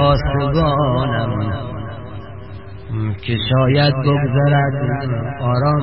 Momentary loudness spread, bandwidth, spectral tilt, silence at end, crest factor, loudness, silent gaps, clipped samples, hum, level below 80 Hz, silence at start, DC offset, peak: 17 LU; 5.8 kHz; -12 dB/octave; 0 s; 14 dB; -17 LUFS; none; under 0.1%; none; -32 dBFS; 0 s; 1%; -2 dBFS